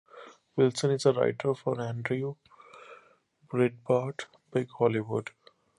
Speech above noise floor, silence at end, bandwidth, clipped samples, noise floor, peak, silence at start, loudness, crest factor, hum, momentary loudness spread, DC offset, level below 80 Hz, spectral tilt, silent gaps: 36 dB; 0.5 s; 11.5 kHz; under 0.1%; -64 dBFS; -10 dBFS; 0.15 s; -29 LUFS; 20 dB; none; 21 LU; under 0.1%; -72 dBFS; -6.5 dB/octave; none